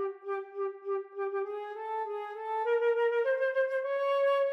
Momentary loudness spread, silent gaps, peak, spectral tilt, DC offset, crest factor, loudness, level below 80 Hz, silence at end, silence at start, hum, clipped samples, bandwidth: 10 LU; none; -20 dBFS; -2.5 dB/octave; under 0.1%; 12 dB; -32 LUFS; under -90 dBFS; 0 s; 0 s; none; under 0.1%; 6 kHz